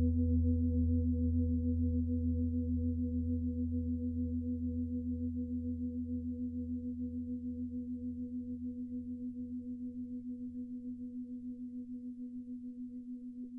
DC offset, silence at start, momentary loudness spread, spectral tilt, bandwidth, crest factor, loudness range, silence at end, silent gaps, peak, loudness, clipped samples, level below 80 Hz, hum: under 0.1%; 0 s; 12 LU; -14 dB/octave; 0.6 kHz; 14 dB; 10 LU; 0 s; none; -22 dBFS; -38 LUFS; under 0.1%; -44 dBFS; none